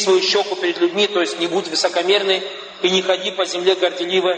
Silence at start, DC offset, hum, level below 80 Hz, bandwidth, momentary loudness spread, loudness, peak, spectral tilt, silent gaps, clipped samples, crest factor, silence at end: 0 s; under 0.1%; none; -74 dBFS; 9.2 kHz; 5 LU; -18 LUFS; -2 dBFS; -2.5 dB/octave; none; under 0.1%; 16 dB; 0 s